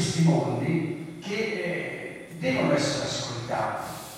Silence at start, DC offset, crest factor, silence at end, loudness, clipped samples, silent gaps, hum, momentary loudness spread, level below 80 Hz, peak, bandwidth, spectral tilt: 0 s; under 0.1%; 16 dB; 0 s; -27 LUFS; under 0.1%; none; none; 11 LU; -60 dBFS; -10 dBFS; 15.5 kHz; -5.5 dB/octave